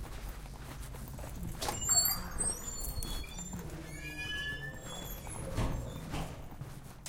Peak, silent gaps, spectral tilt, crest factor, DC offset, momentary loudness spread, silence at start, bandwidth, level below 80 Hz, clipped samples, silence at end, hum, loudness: -16 dBFS; none; -2.5 dB/octave; 22 dB; under 0.1%; 17 LU; 0 s; 17 kHz; -44 dBFS; under 0.1%; 0 s; none; -36 LUFS